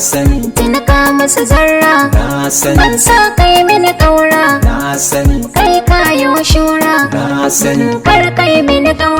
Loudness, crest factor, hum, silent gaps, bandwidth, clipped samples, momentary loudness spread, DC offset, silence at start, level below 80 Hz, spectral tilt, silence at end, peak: -9 LUFS; 8 dB; none; none; over 20 kHz; 0.3%; 5 LU; under 0.1%; 0 s; -18 dBFS; -4 dB/octave; 0 s; 0 dBFS